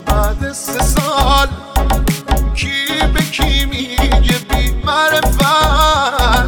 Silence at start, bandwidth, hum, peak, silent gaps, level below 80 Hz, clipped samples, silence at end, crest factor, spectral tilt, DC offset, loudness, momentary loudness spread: 0 s; over 20 kHz; none; 0 dBFS; none; -16 dBFS; under 0.1%; 0 s; 12 dB; -4 dB/octave; under 0.1%; -14 LUFS; 6 LU